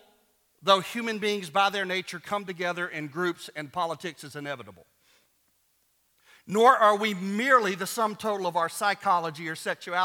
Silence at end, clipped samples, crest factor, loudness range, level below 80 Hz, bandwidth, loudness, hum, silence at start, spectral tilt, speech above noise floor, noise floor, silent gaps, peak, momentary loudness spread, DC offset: 0 s; under 0.1%; 22 dB; 11 LU; -78 dBFS; 18.5 kHz; -26 LUFS; none; 0.65 s; -3.5 dB/octave; 43 dB; -70 dBFS; none; -6 dBFS; 14 LU; under 0.1%